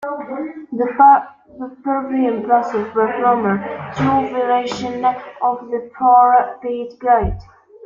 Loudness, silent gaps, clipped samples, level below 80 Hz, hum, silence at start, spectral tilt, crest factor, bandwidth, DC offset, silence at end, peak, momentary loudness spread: -17 LUFS; none; under 0.1%; -40 dBFS; none; 0 s; -7 dB/octave; 16 dB; 7.4 kHz; under 0.1%; 0 s; -2 dBFS; 16 LU